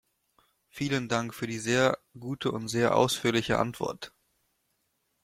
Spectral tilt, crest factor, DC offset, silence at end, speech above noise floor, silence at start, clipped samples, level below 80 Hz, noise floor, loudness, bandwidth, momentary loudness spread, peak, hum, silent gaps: -4.5 dB/octave; 22 dB; under 0.1%; 1.15 s; 48 dB; 0.75 s; under 0.1%; -60 dBFS; -76 dBFS; -28 LUFS; 16 kHz; 12 LU; -8 dBFS; none; none